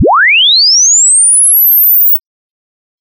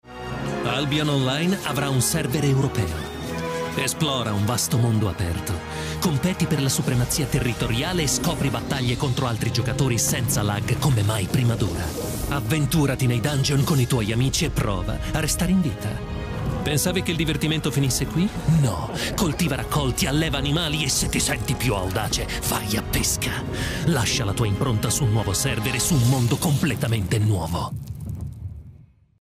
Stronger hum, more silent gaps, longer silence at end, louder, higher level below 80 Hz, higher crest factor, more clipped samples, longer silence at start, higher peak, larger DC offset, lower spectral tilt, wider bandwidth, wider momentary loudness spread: neither; neither; first, 0.8 s vs 0.4 s; first, -3 LUFS vs -23 LUFS; second, -54 dBFS vs -36 dBFS; second, 6 dB vs 14 dB; neither; about the same, 0 s vs 0.05 s; first, -2 dBFS vs -8 dBFS; neither; second, 0 dB/octave vs -4.5 dB/octave; about the same, 16.5 kHz vs 15.5 kHz; second, 2 LU vs 7 LU